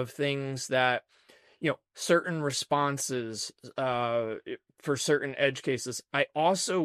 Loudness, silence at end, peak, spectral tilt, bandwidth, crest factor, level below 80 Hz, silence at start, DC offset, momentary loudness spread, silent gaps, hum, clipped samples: -30 LUFS; 0 s; -12 dBFS; -3.5 dB/octave; 14.5 kHz; 18 dB; -74 dBFS; 0 s; under 0.1%; 9 LU; none; none; under 0.1%